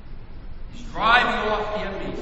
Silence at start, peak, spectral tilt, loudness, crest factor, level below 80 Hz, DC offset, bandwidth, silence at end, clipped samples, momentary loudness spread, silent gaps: 0 s; -2 dBFS; -4.5 dB/octave; -21 LUFS; 22 dB; -36 dBFS; under 0.1%; 8.4 kHz; 0 s; under 0.1%; 25 LU; none